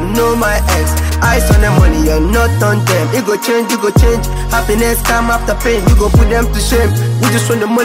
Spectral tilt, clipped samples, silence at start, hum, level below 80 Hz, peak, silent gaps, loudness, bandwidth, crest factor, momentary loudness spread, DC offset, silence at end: -5 dB/octave; under 0.1%; 0 s; none; -16 dBFS; 0 dBFS; none; -12 LUFS; 16.5 kHz; 10 dB; 4 LU; under 0.1%; 0 s